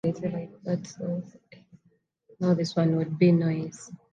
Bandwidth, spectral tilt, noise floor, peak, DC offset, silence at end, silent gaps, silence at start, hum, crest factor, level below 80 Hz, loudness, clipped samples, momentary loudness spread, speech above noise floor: 9 kHz; -7.5 dB/octave; -68 dBFS; -10 dBFS; under 0.1%; 0.2 s; none; 0.05 s; none; 18 dB; -70 dBFS; -27 LUFS; under 0.1%; 14 LU; 41 dB